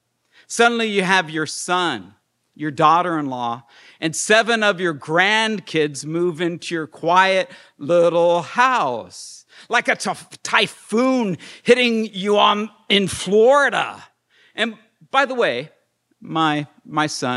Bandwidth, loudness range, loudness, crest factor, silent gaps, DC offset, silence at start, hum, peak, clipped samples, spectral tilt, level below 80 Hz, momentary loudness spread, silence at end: 12.5 kHz; 3 LU; -19 LUFS; 20 dB; none; under 0.1%; 0.5 s; none; 0 dBFS; under 0.1%; -3.5 dB/octave; -62 dBFS; 12 LU; 0 s